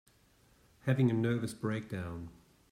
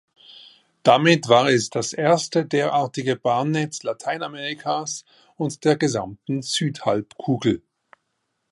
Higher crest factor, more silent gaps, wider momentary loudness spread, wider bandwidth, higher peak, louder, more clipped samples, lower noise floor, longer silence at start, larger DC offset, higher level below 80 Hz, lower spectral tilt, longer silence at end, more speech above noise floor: about the same, 18 dB vs 20 dB; neither; first, 15 LU vs 12 LU; first, 14.5 kHz vs 11.5 kHz; second, -16 dBFS vs -2 dBFS; second, -34 LUFS vs -22 LUFS; neither; second, -66 dBFS vs -75 dBFS; first, 0.85 s vs 0.3 s; neither; about the same, -66 dBFS vs -62 dBFS; first, -7.5 dB/octave vs -4.5 dB/octave; second, 0.4 s vs 0.95 s; second, 34 dB vs 54 dB